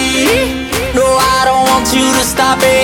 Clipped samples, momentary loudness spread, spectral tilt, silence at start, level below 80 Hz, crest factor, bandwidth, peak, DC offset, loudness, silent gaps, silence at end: under 0.1%; 5 LU; -3 dB/octave; 0 s; -30 dBFS; 10 dB; 17.5 kHz; 0 dBFS; under 0.1%; -11 LUFS; none; 0 s